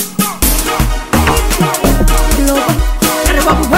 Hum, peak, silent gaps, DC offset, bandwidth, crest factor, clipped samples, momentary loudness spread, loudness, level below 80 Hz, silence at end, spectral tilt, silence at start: none; 0 dBFS; none; under 0.1%; 16.5 kHz; 12 dB; under 0.1%; 3 LU; -12 LUFS; -14 dBFS; 0 s; -4 dB/octave; 0 s